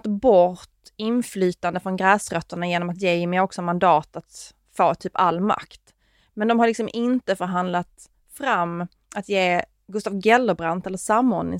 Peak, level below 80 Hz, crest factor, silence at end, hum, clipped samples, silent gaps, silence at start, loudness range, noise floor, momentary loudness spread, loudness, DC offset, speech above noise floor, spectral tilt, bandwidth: -2 dBFS; -58 dBFS; 20 dB; 0 s; none; under 0.1%; none; 0.05 s; 2 LU; -61 dBFS; 14 LU; -22 LUFS; under 0.1%; 39 dB; -5.5 dB/octave; 16 kHz